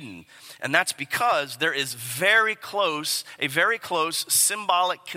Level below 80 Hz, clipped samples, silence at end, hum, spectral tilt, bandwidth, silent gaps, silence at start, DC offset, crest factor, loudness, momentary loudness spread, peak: -74 dBFS; under 0.1%; 0 s; none; -1 dB/octave; 16.5 kHz; none; 0 s; under 0.1%; 22 dB; -23 LUFS; 7 LU; -2 dBFS